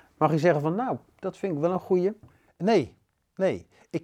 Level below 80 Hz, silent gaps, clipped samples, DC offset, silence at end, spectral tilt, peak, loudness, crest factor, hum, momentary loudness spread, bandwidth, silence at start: -68 dBFS; none; under 0.1%; under 0.1%; 0.05 s; -7.5 dB/octave; -8 dBFS; -27 LUFS; 18 dB; none; 14 LU; 10.5 kHz; 0.2 s